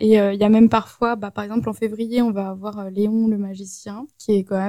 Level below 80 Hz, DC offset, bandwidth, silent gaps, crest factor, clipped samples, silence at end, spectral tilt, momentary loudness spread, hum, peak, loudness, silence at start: -56 dBFS; under 0.1%; 13 kHz; none; 16 dB; under 0.1%; 0 s; -7 dB/octave; 16 LU; none; -4 dBFS; -20 LUFS; 0 s